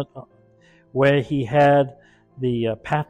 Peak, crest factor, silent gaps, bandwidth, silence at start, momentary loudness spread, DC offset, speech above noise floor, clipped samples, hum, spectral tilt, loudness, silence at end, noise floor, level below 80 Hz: -6 dBFS; 16 dB; none; 9.2 kHz; 0 s; 12 LU; under 0.1%; 35 dB; under 0.1%; none; -8 dB/octave; -20 LUFS; 0.05 s; -55 dBFS; -52 dBFS